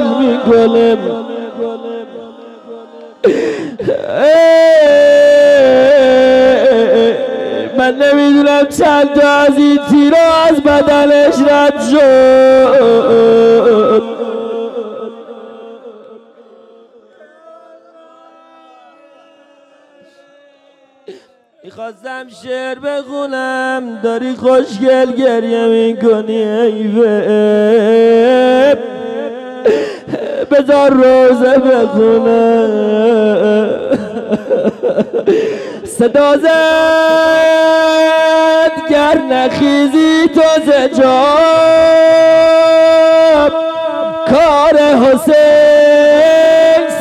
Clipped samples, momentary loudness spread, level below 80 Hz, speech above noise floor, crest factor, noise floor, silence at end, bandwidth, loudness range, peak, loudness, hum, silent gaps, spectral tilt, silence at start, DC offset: under 0.1%; 13 LU; -48 dBFS; 40 dB; 10 dB; -48 dBFS; 0 s; 13 kHz; 9 LU; 0 dBFS; -9 LUFS; none; none; -5 dB/octave; 0 s; under 0.1%